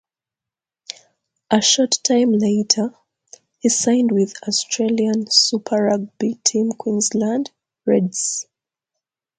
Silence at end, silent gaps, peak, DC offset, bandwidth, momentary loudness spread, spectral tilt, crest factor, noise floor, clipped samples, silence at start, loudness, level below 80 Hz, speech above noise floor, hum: 0.95 s; none; 0 dBFS; under 0.1%; 9.6 kHz; 12 LU; -3 dB/octave; 20 dB; -88 dBFS; under 0.1%; 1.5 s; -18 LUFS; -68 dBFS; 70 dB; none